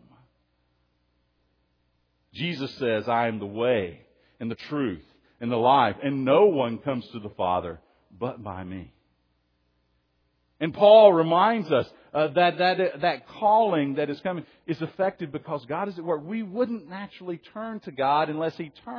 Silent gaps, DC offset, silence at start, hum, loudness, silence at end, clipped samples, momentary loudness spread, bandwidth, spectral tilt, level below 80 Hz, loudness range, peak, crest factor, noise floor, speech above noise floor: none; under 0.1%; 2.35 s; none; -24 LUFS; 0 s; under 0.1%; 16 LU; 5.4 kHz; -8 dB/octave; -64 dBFS; 11 LU; -4 dBFS; 22 dB; -71 dBFS; 47 dB